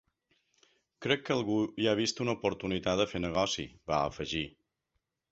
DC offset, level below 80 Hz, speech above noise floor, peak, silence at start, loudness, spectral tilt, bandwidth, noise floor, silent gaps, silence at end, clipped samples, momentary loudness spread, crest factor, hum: under 0.1%; -56 dBFS; 51 dB; -12 dBFS; 1 s; -32 LUFS; -4.5 dB/octave; 8.2 kHz; -83 dBFS; none; 0.85 s; under 0.1%; 6 LU; 20 dB; none